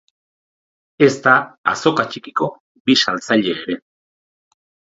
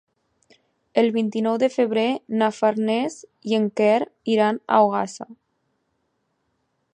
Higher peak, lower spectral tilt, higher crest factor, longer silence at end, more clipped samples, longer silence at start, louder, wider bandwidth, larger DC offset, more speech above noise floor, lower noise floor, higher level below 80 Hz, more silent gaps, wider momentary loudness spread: first, 0 dBFS vs -4 dBFS; second, -4 dB/octave vs -5.5 dB/octave; about the same, 20 dB vs 20 dB; second, 1.15 s vs 1.6 s; neither; about the same, 1 s vs 0.95 s; first, -17 LUFS vs -21 LUFS; second, 8 kHz vs 9.8 kHz; neither; first, over 73 dB vs 51 dB; first, under -90 dBFS vs -72 dBFS; first, -64 dBFS vs -74 dBFS; first, 1.58-1.64 s, 2.60-2.85 s vs none; about the same, 10 LU vs 9 LU